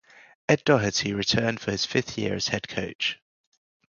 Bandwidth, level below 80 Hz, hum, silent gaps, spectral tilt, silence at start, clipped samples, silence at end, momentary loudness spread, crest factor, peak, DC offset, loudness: 7.4 kHz; -54 dBFS; none; 2.95-2.99 s; -4 dB/octave; 0.5 s; under 0.1%; 0.8 s; 8 LU; 22 dB; -6 dBFS; under 0.1%; -25 LUFS